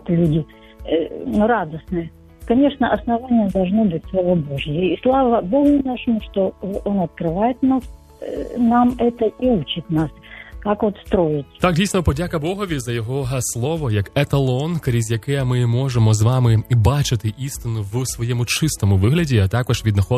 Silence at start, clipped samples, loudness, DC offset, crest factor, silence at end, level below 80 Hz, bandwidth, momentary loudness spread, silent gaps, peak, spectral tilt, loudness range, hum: 0.05 s; under 0.1%; -19 LUFS; under 0.1%; 18 dB; 0 s; -38 dBFS; 14 kHz; 9 LU; none; -2 dBFS; -6.5 dB/octave; 3 LU; none